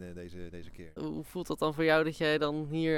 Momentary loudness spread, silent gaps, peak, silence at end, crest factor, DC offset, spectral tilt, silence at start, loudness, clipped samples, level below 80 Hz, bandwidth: 20 LU; none; -14 dBFS; 0 s; 18 dB; under 0.1%; -6 dB/octave; 0 s; -31 LUFS; under 0.1%; -56 dBFS; 17 kHz